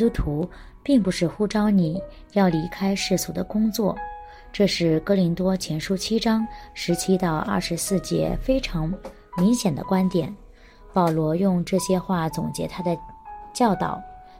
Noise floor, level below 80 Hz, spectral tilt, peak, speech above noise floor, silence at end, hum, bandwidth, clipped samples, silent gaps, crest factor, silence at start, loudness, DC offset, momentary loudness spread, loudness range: -47 dBFS; -40 dBFS; -5.5 dB/octave; -8 dBFS; 24 dB; 0 s; none; 16.5 kHz; under 0.1%; none; 16 dB; 0 s; -23 LUFS; under 0.1%; 12 LU; 2 LU